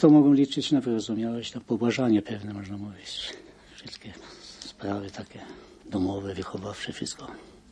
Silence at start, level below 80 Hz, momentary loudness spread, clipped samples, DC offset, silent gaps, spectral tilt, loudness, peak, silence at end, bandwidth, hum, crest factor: 0 s; -62 dBFS; 21 LU; under 0.1%; under 0.1%; none; -6 dB/octave; -27 LUFS; -6 dBFS; 0.3 s; 9.8 kHz; none; 22 dB